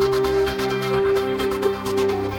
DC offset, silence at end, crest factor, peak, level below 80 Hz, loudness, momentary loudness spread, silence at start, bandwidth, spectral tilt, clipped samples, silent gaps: under 0.1%; 0 s; 12 dB; -8 dBFS; -42 dBFS; -21 LUFS; 3 LU; 0 s; 17.5 kHz; -5.5 dB/octave; under 0.1%; none